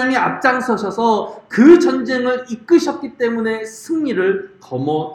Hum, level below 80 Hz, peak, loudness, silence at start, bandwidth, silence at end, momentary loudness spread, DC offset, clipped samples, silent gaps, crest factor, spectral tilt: none; -58 dBFS; 0 dBFS; -16 LUFS; 0 s; 12 kHz; 0 s; 13 LU; under 0.1%; under 0.1%; none; 16 dB; -5.5 dB/octave